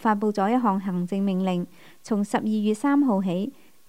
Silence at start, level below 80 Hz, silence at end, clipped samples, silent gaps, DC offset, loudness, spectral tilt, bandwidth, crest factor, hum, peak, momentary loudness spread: 0 s; -72 dBFS; 0.4 s; under 0.1%; none; 0.3%; -24 LUFS; -7 dB/octave; 15 kHz; 16 dB; none; -8 dBFS; 8 LU